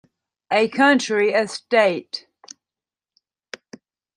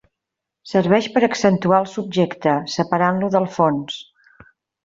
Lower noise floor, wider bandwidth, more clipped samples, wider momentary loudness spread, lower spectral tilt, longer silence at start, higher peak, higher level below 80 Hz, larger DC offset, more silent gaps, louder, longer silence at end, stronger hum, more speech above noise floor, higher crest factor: first, under -90 dBFS vs -83 dBFS; first, 11 kHz vs 7.8 kHz; neither; first, 23 LU vs 6 LU; second, -3.5 dB/octave vs -6 dB/octave; second, 0.5 s vs 0.65 s; about the same, -4 dBFS vs -2 dBFS; second, -74 dBFS vs -60 dBFS; neither; neither; about the same, -19 LUFS vs -19 LUFS; first, 2 s vs 0.85 s; neither; first, over 71 dB vs 65 dB; about the same, 18 dB vs 16 dB